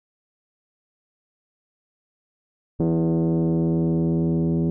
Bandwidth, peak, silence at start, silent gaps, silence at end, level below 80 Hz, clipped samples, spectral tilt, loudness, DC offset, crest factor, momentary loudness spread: 1.6 kHz; -12 dBFS; 2.8 s; none; 0 s; -48 dBFS; under 0.1%; -14 dB/octave; -22 LUFS; under 0.1%; 12 dB; 2 LU